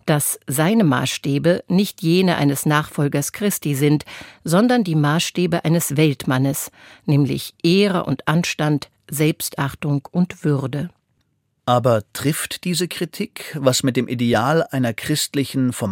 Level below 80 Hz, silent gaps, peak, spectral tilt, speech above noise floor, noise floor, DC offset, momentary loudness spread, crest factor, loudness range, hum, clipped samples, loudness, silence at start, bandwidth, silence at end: -56 dBFS; none; 0 dBFS; -5 dB/octave; 48 dB; -67 dBFS; under 0.1%; 8 LU; 18 dB; 3 LU; none; under 0.1%; -19 LUFS; 0.05 s; 17 kHz; 0 s